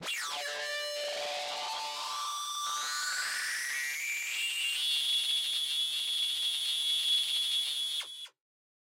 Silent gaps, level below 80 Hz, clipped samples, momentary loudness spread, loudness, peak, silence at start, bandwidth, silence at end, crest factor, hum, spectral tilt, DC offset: none; -88 dBFS; under 0.1%; 8 LU; -31 LUFS; -20 dBFS; 0 s; 16 kHz; 0.7 s; 14 dB; none; 3 dB/octave; under 0.1%